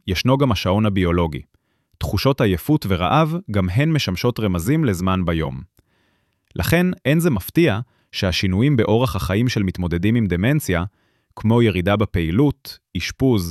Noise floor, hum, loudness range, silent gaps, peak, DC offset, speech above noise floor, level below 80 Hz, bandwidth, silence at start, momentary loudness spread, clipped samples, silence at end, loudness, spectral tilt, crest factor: -65 dBFS; none; 2 LU; none; -4 dBFS; under 0.1%; 47 dB; -38 dBFS; 14.5 kHz; 0.05 s; 8 LU; under 0.1%; 0 s; -19 LUFS; -6.5 dB/octave; 16 dB